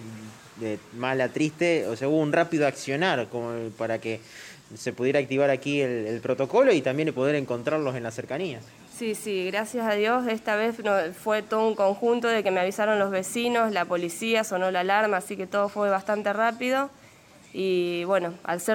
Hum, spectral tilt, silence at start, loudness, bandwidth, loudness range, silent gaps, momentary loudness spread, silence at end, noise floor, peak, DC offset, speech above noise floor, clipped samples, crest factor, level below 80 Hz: none; -5 dB/octave; 0 s; -26 LUFS; 17 kHz; 3 LU; none; 11 LU; 0 s; -52 dBFS; -8 dBFS; under 0.1%; 27 dB; under 0.1%; 18 dB; -70 dBFS